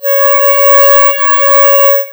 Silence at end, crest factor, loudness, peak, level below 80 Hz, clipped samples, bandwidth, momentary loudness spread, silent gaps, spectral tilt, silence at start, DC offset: 0 s; 8 dB; -5 LUFS; 0 dBFS; -56 dBFS; 5%; over 20 kHz; 3 LU; none; 1.5 dB/octave; 0 s; under 0.1%